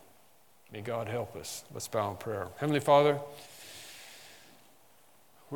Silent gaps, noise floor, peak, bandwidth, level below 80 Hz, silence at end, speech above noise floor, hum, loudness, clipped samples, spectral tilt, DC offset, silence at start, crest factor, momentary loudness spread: none; -64 dBFS; -12 dBFS; 18 kHz; -76 dBFS; 0 s; 33 dB; none; -31 LUFS; under 0.1%; -5 dB/octave; under 0.1%; 0.7 s; 22 dB; 24 LU